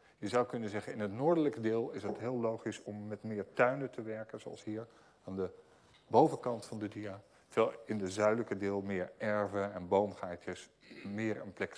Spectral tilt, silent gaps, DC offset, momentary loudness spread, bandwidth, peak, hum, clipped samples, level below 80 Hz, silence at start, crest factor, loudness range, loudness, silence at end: -6.5 dB/octave; none; under 0.1%; 14 LU; 11 kHz; -12 dBFS; none; under 0.1%; -78 dBFS; 0.2 s; 24 dB; 4 LU; -36 LUFS; 0 s